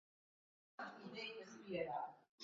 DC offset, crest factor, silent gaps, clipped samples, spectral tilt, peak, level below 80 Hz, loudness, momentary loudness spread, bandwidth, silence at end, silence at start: under 0.1%; 20 dB; 2.29-2.38 s; under 0.1%; -2.5 dB/octave; -32 dBFS; -84 dBFS; -49 LUFS; 10 LU; 7.4 kHz; 0 s; 0.8 s